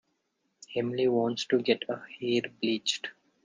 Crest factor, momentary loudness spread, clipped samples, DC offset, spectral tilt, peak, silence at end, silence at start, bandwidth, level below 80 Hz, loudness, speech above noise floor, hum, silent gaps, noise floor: 20 dB; 9 LU; under 0.1%; under 0.1%; -4 dB/octave; -12 dBFS; 0.35 s; 0.7 s; 9.8 kHz; -74 dBFS; -30 LUFS; 48 dB; none; none; -78 dBFS